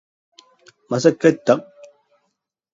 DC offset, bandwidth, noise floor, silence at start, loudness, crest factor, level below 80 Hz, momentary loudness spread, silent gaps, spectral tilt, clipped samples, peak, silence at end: under 0.1%; 7.8 kHz; -74 dBFS; 0.9 s; -18 LUFS; 22 dB; -68 dBFS; 6 LU; none; -6 dB/octave; under 0.1%; 0 dBFS; 1.1 s